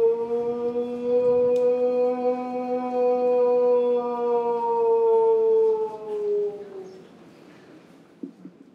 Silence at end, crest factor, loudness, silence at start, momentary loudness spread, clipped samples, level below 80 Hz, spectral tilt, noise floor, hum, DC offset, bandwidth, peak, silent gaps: 0.25 s; 10 dB; -23 LUFS; 0 s; 17 LU; under 0.1%; -70 dBFS; -7.5 dB/octave; -50 dBFS; none; under 0.1%; 5.4 kHz; -12 dBFS; none